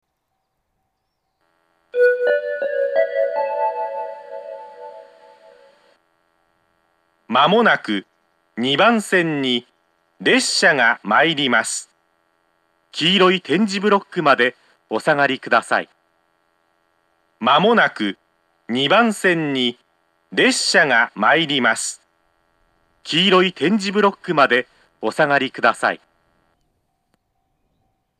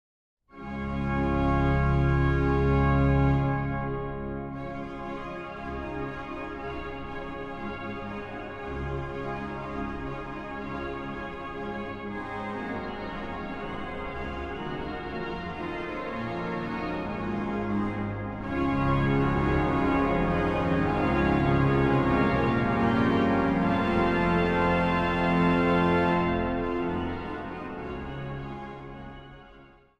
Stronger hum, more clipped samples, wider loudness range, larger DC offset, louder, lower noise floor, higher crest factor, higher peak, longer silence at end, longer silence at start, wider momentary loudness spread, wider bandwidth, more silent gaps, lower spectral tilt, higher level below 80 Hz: neither; neither; second, 6 LU vs 11 LU; neither; first, -17 LUFS vs -28 LUFS; first, -74 dBFS vs -53 dBFS; about the same, 20 dB vs 16 dB; first, 0 dBFS vs -12 dBFS; first, 2.25 s vs 0.35 s; first, 1.95 s vs 0.55 s; about the same, 14 LU vs 13 LU; first, 14.5 kHz vs 7.8 kHz; neither; second, -3.5 dB/octave vs -8.5 dB/octave; second, -76 dBFS vs -38 dBFS